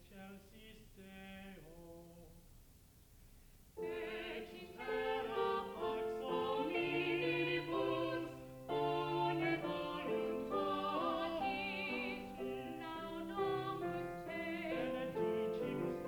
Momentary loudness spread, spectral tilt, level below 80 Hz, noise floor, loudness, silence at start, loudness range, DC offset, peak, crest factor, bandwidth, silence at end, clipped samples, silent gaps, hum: 18 LU; -6 dB/octave; -66 dBFS; -63 dBFS; -40 LUFS; 0 s; 12 LU; under 0.1%; -24 dBFS; 16 dB; over 20 kHz; 0 s; under 0.1%; none; none